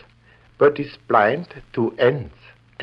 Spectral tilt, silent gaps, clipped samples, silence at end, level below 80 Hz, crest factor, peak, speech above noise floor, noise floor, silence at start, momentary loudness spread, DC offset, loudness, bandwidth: -8.5 dB/octave; none; under 0.1%; 0 s; -54 dBFS; 18 dB; -4 dBFS; 33 dB; -53 dBFS; 0.6 s; 13 LU; under 0.1%; -20 LUFS; 5.6 kHz